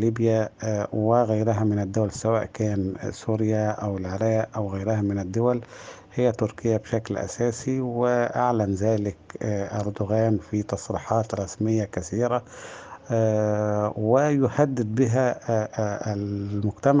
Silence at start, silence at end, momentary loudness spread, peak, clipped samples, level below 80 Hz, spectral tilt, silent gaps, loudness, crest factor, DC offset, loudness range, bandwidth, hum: 0 s; 0 s; 8 LU; -4 dBFS; under 0.1%; -58 dBFS; -7.5 dB/octave; none; -25 LUFS; 20 dB; under 0.1%; 3 LU; 9.6 kHz; none